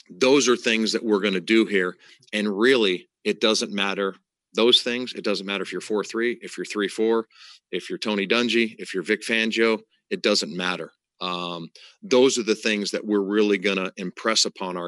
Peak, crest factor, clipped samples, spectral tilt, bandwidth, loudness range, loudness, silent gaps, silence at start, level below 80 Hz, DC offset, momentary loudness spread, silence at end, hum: -6 dBFS; 18 dB; under 0.1%; -3 dB/octave; 12 kHz; 3 LU; -23 LUFS; none; 0.1 s; -82 dBFS; under 0.1%; 12 LU; 0 s; none